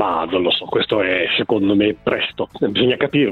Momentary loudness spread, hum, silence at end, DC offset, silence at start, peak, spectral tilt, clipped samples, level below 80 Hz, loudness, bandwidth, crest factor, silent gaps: 4 LU; none; 0 s; under 0.1%; 0 s; -4 dBFS; -7.5 dB/octave; under 0.1%; -52 dBFS; -18 LUFS; 4.5 kHz; 14 dB; none